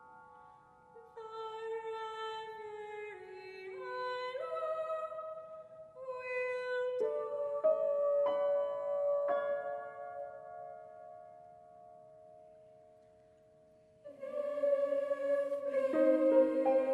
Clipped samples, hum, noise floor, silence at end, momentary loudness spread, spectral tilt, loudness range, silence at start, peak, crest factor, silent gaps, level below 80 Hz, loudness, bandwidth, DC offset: under 0.1%; none; -64 dBFS; 0 s; 21 LU; -5.5 dB/octave; 17 LU; 0 s; -16 dBFS; 20 dB; none; -84 dBFS; -35 LUFS; 8.2 kHz; under 0.1%